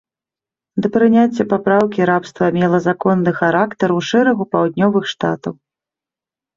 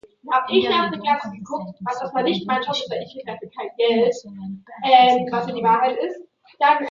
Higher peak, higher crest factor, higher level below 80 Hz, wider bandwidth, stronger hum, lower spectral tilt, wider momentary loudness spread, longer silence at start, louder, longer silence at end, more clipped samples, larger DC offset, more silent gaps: about the same, -2 dBFS vs -2 dBFS; about the same, 14 dB vs 18 dB; first, -58 dBFS vs -64 dBFS; about the same, 7.4 kHz vs 7.6 kHz; neither; first, -7 dB/octave vs -5 dB/octave; second, 7 LU vs 17 LU; first, 0.75 s vs 0.25 s; first, -16 LUFS vs -20 LUFS; first, 1.05 s vs 0 s; neither; neither; neither